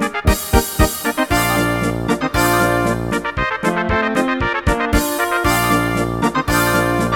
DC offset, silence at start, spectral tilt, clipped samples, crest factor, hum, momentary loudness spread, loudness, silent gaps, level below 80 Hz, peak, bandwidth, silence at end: under 0.1%; 0 s; -4.5 dB/octave; under 0.1%; 16 dB; none; 4 LU; -17 LUFS; none; -26 dBFS; 0 dBFS; 19 kHz; 0 s